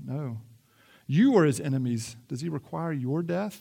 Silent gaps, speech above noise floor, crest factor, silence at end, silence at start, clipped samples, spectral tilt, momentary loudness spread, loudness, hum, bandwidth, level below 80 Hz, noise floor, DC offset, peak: none; 33 dB; 18 dB; 0 s; 0 s; under 0.1%; -7 dB/octave; 16 LU; -27 LUFS; none; 16.5 kHz; -70 dBFS; -60 dBFS; under 0.1%; -10 dBFS